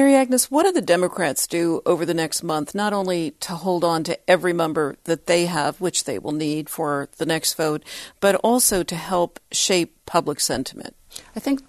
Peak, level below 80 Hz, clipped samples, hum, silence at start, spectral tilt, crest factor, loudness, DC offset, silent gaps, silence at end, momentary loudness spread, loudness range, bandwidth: -4 dBFS; -54 dBFS; under 0.1%; none; 0 s; -3.5 dB/octave; 18 dB; -21 LUFS; under 0.1%; none; 0.1 s; 9 LU; 2 LU; 13.5 kHz